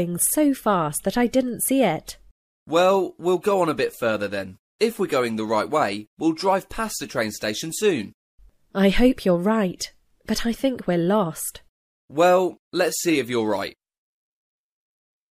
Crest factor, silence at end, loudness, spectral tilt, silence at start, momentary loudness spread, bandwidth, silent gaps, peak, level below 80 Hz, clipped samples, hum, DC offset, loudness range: 18 dB; 1.65 s; -22 LUFS; -4.5 dB/octave; 0 s; 10 LU; 15.5 kHz; 2.31-2.66 s, 4.59-4.79 s, 6.07-6.17 s, 8.14-8.38 s, 11.69-12.08 s, 12.59-12.71 s; -6 dBFS; -44 dBFS; under 0.1%; none; under 0.1%; 2 LU